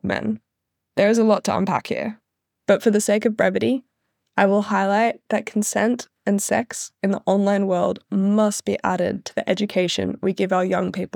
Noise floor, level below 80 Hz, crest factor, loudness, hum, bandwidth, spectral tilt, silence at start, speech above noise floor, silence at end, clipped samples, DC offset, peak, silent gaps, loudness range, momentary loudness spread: -79 dBFS; -66 dBFS; 18 dB; -21 LUFS; none; 18 kHz; -5 dB/octave; 0.05 s; 59 dB; 0.1 s; under 0.1%; under 0.1%; -2 dBFS; none; 1 LU; 8 LU